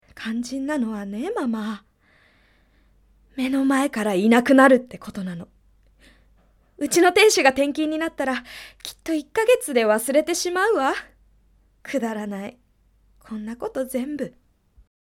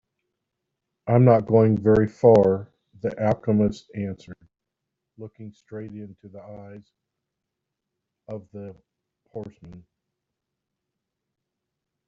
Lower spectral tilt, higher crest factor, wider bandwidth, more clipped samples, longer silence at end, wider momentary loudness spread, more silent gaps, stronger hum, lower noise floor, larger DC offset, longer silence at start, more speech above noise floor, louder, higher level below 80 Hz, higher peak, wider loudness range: second, -3.5 dB/octave vs -9.5 dB/octave; about the same, 22 dB vs 22 dB; first, 17 kHz vs 7.4 kHz; neither; second, 0.75 s vs 2.3 s; second, 19 LU vs 25 LU; neither; neither; second, -60 dBFS vs -84 dBFS; neither; second, 0.15 s vs 1.05 s; second, 39 dB vs 62 dB; about the same, -21 LUFS vs -20 LUFS; about the same, -58 dBFS vs -56 dBFS; first, 0 dBFS vs -4 dBFS; second, 10 LU vs 23 LU